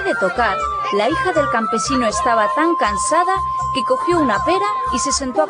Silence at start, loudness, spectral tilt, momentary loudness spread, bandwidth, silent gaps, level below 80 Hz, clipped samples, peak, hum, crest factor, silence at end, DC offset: 0 s; -17 LUFS; -3.5 dB/octave; 3 LU; 10 kHz; none; -40 dBFS; under 0.1%; -4 dBFS; none; 14 dB; 0 s; under 0.1%